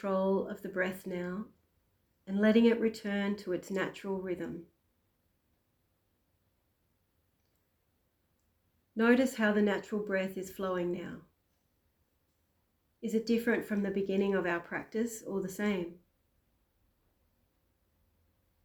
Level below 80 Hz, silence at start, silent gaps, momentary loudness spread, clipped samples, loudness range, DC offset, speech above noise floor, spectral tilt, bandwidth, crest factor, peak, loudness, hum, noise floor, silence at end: -70 dBFS; 0 s; none; 13 LU; under 0.1%; 9 LU; under 0.1%; 45 dB; -6 dB/octave; 19.5 kHz; 20 dB; -14 dBFS; -32 LUFS; none; -77 dBFS; 2.7 s